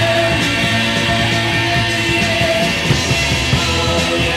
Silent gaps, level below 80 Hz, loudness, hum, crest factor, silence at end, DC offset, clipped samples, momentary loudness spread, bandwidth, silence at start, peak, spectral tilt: none; -30 dBFS; -14 LUFS; none; 14 dB; 0 s; under 0.1%; under 0.1%; 1 LU; 16.5 kHz; 0 s; -2 dBFS; -4 dB/octave